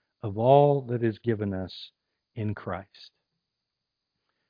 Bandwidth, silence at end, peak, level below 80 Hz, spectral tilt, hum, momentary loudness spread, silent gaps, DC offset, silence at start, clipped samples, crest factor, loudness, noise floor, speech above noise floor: 5.2 kHz; 1.45 s; -6 dBFS; -66 dBFS; -10 dB/octave; none; 20 LU; none; under 0.1%; 0.25 s; under 0.1%; 22 dB; -26 LUFS; -84 dBFS; 59 dB